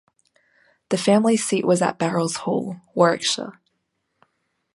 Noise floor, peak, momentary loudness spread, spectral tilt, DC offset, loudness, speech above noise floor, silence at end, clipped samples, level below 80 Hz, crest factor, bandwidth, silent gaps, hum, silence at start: -74 dBFS; -2 dBFS; 9 LU; -4.5 dB/octave; under 0.1%; -21 LUFS; 54 dB; 1.25 s; under 0.1%; -68 dBFS; 20 dB; 11.5 kHz; none; none; 0.9 s